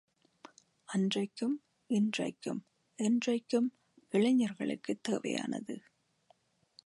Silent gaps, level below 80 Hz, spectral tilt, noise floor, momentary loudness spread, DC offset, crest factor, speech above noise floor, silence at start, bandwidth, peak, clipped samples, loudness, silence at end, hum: none; -84 dBFS; -5.5 dB/octave; -70 dBFS; 11 LU; under 0.1%; 16 dB; 38 dB; 0.9 s; 11.5 kHz; -18 dBFS; under 0.1%; -34 LUFS; 1.05 s; none